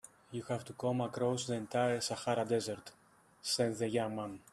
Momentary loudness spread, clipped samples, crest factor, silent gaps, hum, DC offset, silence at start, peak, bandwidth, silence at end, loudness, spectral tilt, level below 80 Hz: 10 LU; under 0.1%; 18 dB; none; none; under 0.1%; 0.3 s; -18 dBFS; 13.5 kHz; 0.15 s; -36 LUFS; -4.5 dB/octave; -74 dBFS